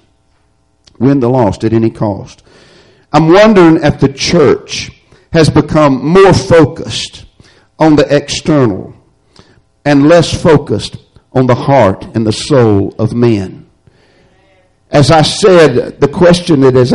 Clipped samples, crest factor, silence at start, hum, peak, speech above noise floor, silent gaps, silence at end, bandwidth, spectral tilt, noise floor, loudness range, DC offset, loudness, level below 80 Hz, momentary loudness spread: 0.2%; 10 dB; 1 s; none; 0 dBFS; 47 dB; none; 0 s; 11.5 kHz; -6 dB/octave; -54 dBFS; 4 LU; under 0.1%; -9 LUFS; -34 dBFS; 12 LU